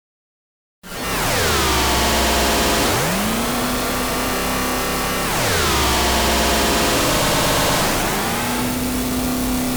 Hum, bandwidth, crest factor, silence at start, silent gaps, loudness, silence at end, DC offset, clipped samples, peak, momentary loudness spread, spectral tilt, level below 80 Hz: none; over 20 kHz; 10 dB; 0.85 s; none; -18 LUFS; 0 s; under 0.1%; under 0.1%; -8 dBFS; 5 LU; -3 dB/octave; -30 dBFS